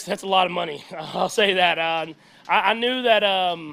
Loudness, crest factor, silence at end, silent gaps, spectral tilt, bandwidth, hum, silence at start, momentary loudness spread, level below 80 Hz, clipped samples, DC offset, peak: -20 LUFS; 18 dB; 0 s; none; -3 dB/octave; 15.5 kHz; none; 0 s; 12 LU; -70 dBFS; under 0.1%; under 0.1%; -4 dBFS